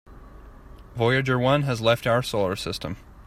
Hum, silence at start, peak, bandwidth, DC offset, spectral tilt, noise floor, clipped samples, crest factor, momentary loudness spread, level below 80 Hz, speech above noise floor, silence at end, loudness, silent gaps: none; 0.1 s; -8 dBFS; 15 kHz; under 0.1%; -5.5 dB/octave; -45 dBFS; under 0.1%; 18 dB; 11 LU; -48 dBFS; 22 dB; 0.05 s; -23 LUFS; none